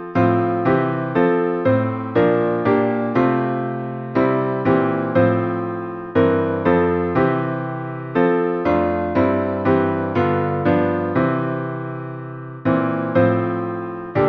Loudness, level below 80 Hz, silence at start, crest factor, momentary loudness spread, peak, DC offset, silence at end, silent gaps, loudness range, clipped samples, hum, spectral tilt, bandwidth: -19 LUFS; -50 dBFS; 0 s; 16 dB; 8 LU; -4 dBFS; under 0.1%; 0 s; none; 2 LU; under 0.1%; none; -10 dB/octave; 5.8 kHz